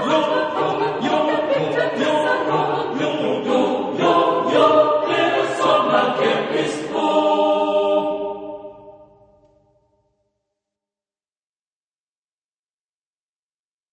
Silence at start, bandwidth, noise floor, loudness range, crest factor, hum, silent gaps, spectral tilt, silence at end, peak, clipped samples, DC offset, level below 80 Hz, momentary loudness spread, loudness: 0 s; 9.8 kHz; under -90 dBFS; 7 LU; 18 dB; none; none; -5 dB/octave; 4.9 s; -2 dBFS; under 0.1%; under 0.1%; -64 dBFS; 6 LU; -19 LUFS